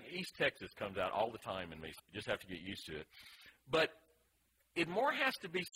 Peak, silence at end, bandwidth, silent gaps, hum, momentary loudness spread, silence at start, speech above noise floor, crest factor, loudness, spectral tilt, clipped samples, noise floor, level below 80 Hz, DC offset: -20 dBFS; 0.05 s; 16 kHz; none; none; 15 LU; 0 s; 37 dB; 20 dB; -39 LUFS; -4 dB/octave; under 0.1%; -77 dBFS; -70 dBFS; under 0.1%